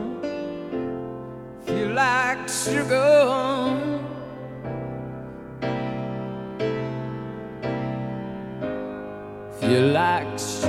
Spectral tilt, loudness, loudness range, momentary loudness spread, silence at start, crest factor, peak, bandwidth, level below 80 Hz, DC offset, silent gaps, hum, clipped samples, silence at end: -5 dB/octave; -25 LUFS; 9 LU; 16 LU; 0 s; 18 dB; -6 dBFS; 15.5 kHz; -54 dBFS; under 0.1%; none; none; under 0.1%; 0 s